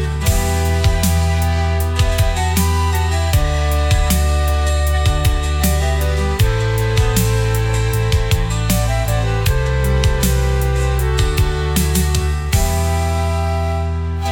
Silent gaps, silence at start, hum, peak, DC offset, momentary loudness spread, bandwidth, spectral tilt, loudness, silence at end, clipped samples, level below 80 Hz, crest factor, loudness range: none; 0 s; none; -2 dBFS; under 0.1%; 2 LU; 19 kHz; -5 dB/octave; -17 LUFS; 0 s; under 0.1%; -20 dBFS; 14 dB; 1 LU